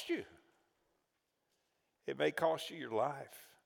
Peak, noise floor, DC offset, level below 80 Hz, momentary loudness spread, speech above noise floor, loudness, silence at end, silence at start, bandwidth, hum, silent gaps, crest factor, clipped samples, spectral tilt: -20 dBFS; -84 dBFS; under 0.1%; -86 dBFS; 16 LU; 46 dB; -38 LUFS; 0.2 s; 0 s; over 20 kHz; none; none; 22 dB; under 0.1%; -4.5 dB/octave